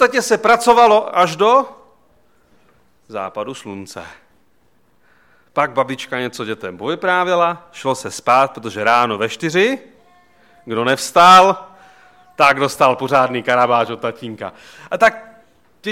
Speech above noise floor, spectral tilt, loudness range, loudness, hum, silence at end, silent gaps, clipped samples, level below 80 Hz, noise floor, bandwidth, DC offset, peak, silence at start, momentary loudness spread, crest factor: 44 dB; -3.5 dB/octave; 12 LU; -15 LUFS; none; 0 s; none; under 0.1%; -58 dBFS; -60 dBFS; 16.5 kHz; 0.1%; 0 dBFS; 0 s; 18 LU; 16 dB